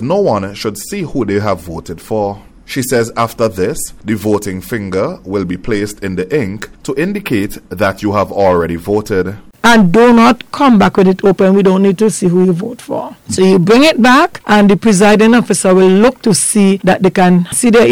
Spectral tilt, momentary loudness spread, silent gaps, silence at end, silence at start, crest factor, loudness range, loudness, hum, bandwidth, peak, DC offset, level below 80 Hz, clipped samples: -5.5 dB/octave; 13 LU; none; 0 s; 0 s; 8 dB; 8 LU; -11 LUFS; none; 17 kHz; -2 dBFS; under 0.1%; -40 dBFS; under 0.1%